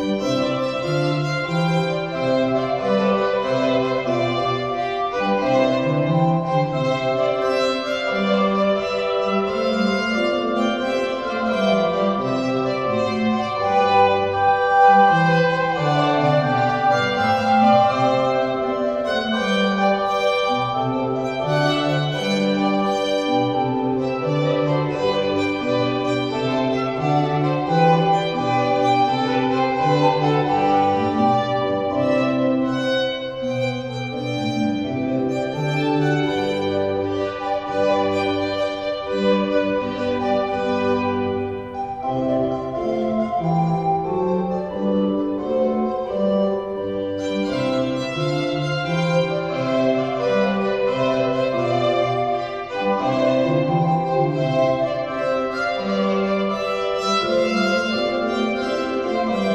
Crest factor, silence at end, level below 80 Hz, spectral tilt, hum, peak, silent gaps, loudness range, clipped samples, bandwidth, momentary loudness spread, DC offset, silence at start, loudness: 16 dB; 0 s; -52 dBFS; -6.5 dB/octave; none; -4 dBFS; none; 5 LU; under 0.1%; 10 kHz; 5 LU; 0.1%; 0 s; -20 LUFS